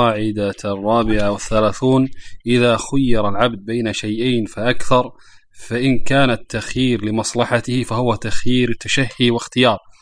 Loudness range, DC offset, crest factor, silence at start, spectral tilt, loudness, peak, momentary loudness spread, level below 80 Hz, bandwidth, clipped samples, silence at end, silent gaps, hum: 2 LU; under 0.1%; 16 dB; 0 s; -5 dB/octave; -18 LUFS; 0 dBFS; 6 LU; -34 dBFS; 10.5 kHz; under 0.1%; 0.25 s; none; none